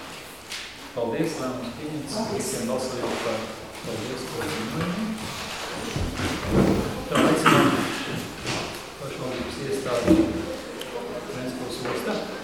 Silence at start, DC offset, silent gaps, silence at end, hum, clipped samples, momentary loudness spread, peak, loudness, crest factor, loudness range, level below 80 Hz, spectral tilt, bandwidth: 0 s; 0.1%; none; 0 s; none; under 0.1%; 13 LU; -4 dBFS; -26 LUFS; 22 dB; 6 LU; -44 dBFS; -5 dB/octave; 17.5 kHz